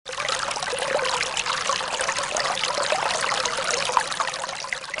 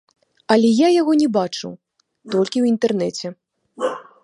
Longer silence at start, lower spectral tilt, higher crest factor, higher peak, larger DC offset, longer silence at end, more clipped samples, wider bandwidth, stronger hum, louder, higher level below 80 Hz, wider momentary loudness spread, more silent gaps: second, 0.05 s vs 0.5 s; second, 0 dB/octave vs -5.5 dB/octave; first, 24 dB vs 18 dB; about the same, -2 dBFS vs -2 dBFS; neither; second, 0 s vs 0.2 s; neither; about the same, 11.5 kHz vs 11 kHz; neither; second, -24 LUFS vs -18 LUFS; first, -58 dBFS vs -68 dBFS; second, 4 LU vs 15 LU; neither